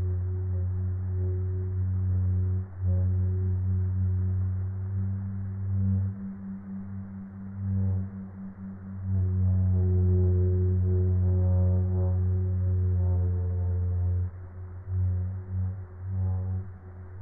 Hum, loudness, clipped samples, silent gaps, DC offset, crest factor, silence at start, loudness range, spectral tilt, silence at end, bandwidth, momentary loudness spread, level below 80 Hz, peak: none; -28 LUFS; under 0.1%; none; under 0.1%; 12 dB; 0 s; 7 LU; -15 dB/octave; 0 s; 2 kHz; 14 LU; -44 dBFS; -16 dBFS